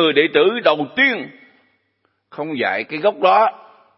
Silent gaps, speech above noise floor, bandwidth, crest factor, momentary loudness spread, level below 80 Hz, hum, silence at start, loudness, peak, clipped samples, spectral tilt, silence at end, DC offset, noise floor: none; 51 dB; 5.8 kHz; 18 dB; 13 LU; -72 dBFS; none; 0 s; -17 LUFS; 0 dBFS; under 0.1%; -9 dB/octave; 0.4 s; under 0.1%; -67 dBFS